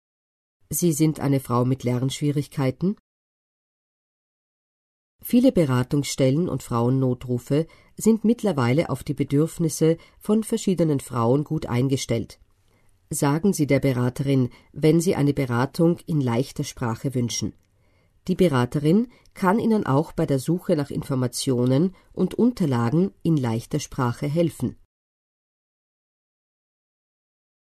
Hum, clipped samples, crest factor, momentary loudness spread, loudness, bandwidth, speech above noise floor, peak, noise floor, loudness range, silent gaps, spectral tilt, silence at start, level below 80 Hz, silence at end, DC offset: none; under 0.1%; 18 dB; 7 LU; -23 LUFS; 13.5 kHz; 40 dB; -6 dBFS; -62 dBFS; 5 LU; 3.00-5.19 s; -6.5 dB/octave; 0.7 s; -52 dBFS; 2.9 s; under 0.1%